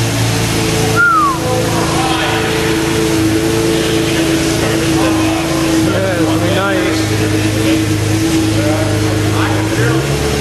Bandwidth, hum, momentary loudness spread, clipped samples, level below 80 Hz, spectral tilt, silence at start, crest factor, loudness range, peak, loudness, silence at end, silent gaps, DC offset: 13 kHz; none; 2 LU; under 0.1%; -30 dBFS; -5 dB/octave; 0 s; 12 dB; 1 LU; 0 dBFS; -13 LUFS; 0 s; none; under 0.1%